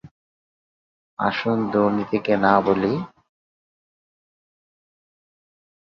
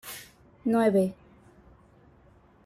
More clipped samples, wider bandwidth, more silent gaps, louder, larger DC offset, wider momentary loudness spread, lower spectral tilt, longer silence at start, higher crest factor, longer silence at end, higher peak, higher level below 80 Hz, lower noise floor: neither; second, 6.6 kHz vs 16 kHz; first, 0.11-1.17 s vs none; first, -21 LUFS vs -26 LUFS; neither; second, 11 LU vs 19 LU; first, -8 dB/octave vs -6.5 dB/octave; about the same, 0.05 s vs 0.05 s; about the same, 22 dB vs 18 dB; first, 2.85 s vs 1.5 s; first, -2 dBFS vs -12 dBFS; about the same, -60 dBFS vs -64 dBFS; first, under -90 dBFS vs -58 dBFS